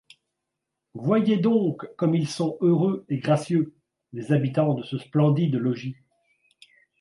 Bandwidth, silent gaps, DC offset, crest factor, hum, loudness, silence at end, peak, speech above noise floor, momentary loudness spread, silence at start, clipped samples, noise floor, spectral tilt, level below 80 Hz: 11.5 kHz; none; under 0.1%; 16 dB; none; -24 LUFS; 1.1 s; -8 dBFS; 60 dB; 11 LU; 0.95 s; under 0.1%; -83 dBFS; -8 dB/octave; -70 dBFS